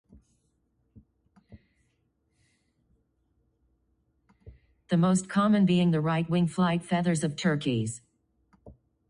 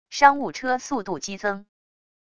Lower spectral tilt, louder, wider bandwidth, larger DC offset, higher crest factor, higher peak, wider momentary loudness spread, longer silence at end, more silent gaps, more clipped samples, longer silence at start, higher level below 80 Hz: first, -6.5 dB/octave vs -3 dB/octave; second, -26 LUFS vs -23 LUFS; about the same, 10.5 kHz vs 10 kHz; neither; second, 16 dB vs 24 dB; second, -12 dBFS vs 0 dBFS; second, 7 LU vs 12 LU; second, 0.4 s vs 0.75 s; neither; neither; first, 0.95 s vs 0.1 s; about the same, -62 dBFS vs -62 dBFS